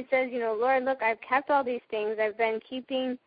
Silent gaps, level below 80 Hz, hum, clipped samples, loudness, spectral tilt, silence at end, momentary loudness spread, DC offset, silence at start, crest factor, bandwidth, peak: none; -72 dBFS; none; under 0.1%; -28 LUFS; -7.5 dB/octave; 0.1 s; 6 LU; under 0.1%; 0 s; 16 dB; 5 kHz; -12 dBFS